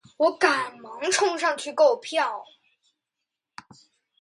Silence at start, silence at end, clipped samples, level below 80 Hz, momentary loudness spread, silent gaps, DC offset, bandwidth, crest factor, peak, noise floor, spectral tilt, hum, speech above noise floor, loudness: 0.2 s; 1.75 s; under 0.1%; -80 dBFS; 10 LU; none; under 0.1%; 11.5 kHz; 22 dB; -4 dBFS; -85 dBFS; -1 dB/octave; none; 62 dB; -24 LUFS